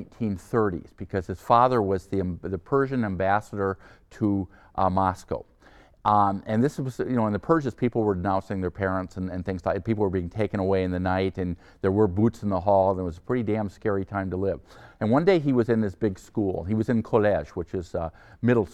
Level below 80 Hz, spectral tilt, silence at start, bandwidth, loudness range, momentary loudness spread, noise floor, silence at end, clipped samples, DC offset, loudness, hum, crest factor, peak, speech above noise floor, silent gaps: -50 dBFS; -8.5 dB/octave; 0 s; 12.5 kHz; 2 LU; 10 LU; -54 dBFS; 0.05 s; under 0.1%; under 0.1%; -26 LUFS; none; 20 dB; -6 dBFS; 29 dB; none